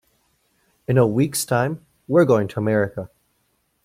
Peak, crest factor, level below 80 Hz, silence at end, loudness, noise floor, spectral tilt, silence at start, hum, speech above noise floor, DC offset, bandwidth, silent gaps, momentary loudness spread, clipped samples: -4 dBFS; 18 dB; -58 dBFS; 0.8 s; -20 LUFS; -68 dBFS; -6 dB/octave; 0.9 s; none; 49 dB; under 0.1%; 16 kHz; none; 18 LU; under 0.1%